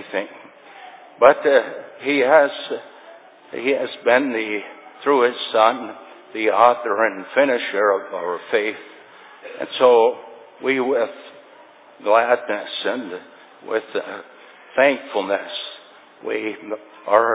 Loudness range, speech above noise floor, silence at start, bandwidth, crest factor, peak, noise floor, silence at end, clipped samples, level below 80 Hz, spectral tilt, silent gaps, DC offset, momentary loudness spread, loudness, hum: 5 LU; 28 dB; 0 s; 4 kHz; 20 dB; 0 dBFS; -47 dBFS; 0 s; under 0.1%; -72 dBFS; -7.5 dB/octave; none; under 0.1%; 20 LU; -19 LUFS; none